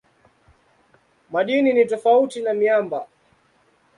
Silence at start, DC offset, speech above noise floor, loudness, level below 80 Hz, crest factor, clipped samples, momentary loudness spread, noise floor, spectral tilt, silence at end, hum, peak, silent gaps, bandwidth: 1.3 s; under 0.1%; 42 dB; -20 LUFS; -70 dBFS; 16 dB; under 0.1%; 12 LU; -61 dBFS; -5.5 dB/octave; 0.9 s; none; -6 dBFS; none; 11.5 kHz